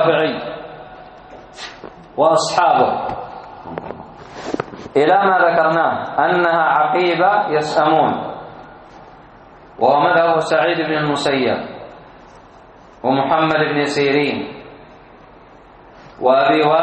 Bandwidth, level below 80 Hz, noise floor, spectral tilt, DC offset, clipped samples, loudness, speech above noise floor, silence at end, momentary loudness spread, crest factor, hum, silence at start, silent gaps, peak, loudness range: 8.4 kHz; -54 dBFS; -43 dBFS; -5 dB/octave; under 0.1%; under 0.1%; -16 LUFS; 28 dB; 0 s; 20 LU; 16 dB; none; 0 s; none; -2 dBFS; 4 LU